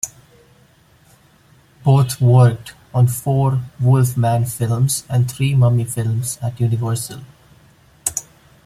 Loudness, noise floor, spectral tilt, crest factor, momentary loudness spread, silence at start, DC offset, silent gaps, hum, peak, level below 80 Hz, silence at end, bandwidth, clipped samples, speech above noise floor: -17 LUFS; -52 dBFS; -6 dB/octave; 18 dB; 11 LU; 0.05 s; under 0.1%; none; none; 0 dBFS; -50 dBFS; 0.45 s; 15 kHz; under 0.1%; 36 dB